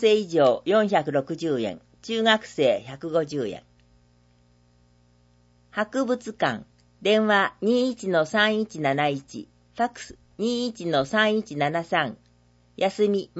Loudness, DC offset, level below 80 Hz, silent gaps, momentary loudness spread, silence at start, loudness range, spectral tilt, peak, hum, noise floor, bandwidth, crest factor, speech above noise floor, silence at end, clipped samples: -24 LUFS; under 0.1%; -64 dBFS; none; 12 LU; 0 s; 8 LU; -5 dB/octave; -4 dBFS; 60 Hz at -55 dBFS; -60 dBFS; 8 kHz; 20 dB; 36 dB; 0 s; under 0.1%